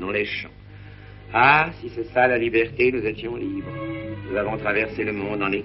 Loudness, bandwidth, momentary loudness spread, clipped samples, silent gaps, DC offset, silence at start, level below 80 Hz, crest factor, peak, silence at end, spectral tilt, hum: -22 LUFS; 5.8 kHz; 14 LU; under 0.1%; none; under 0.1%; 0 s; -48 dBFS; 20 dB; -2 dBFS; 0 s; -3.5 dB/octave; 50 Hz at -40 dBFS